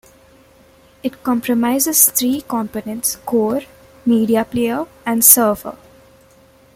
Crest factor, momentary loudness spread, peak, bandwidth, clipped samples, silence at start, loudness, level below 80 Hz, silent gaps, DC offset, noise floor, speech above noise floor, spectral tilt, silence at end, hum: 18 dB; 15 LU; 0 dBFS; 16.5 kHz; under 0.1%; 1.05 s; -15 LUFS; -54 dBFS; none; under 0.1%; -49 dBFS; 33 dB; -3 dB/octave; 1 s; none